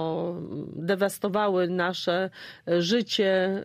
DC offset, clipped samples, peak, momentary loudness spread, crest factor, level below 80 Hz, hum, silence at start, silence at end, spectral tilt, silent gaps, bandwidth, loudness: under 0.1%; under 0.1%; -12 dBFS; 10 LU; 14 dB; -70 dBFS; none; 0 s; 0 s; -5 dB/octave; none; 15.5 kHz; -26 LUFS